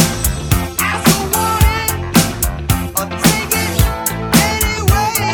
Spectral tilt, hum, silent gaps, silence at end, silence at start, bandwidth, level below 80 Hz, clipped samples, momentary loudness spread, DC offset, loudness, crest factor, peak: -4 dB/octave; none; none; 0 s; 0 s; over 20 kHz; -22 dBFS; under 0.1%; 5 LU; under 0.1%; -15 LUFS; 14 dB; 0 dBFS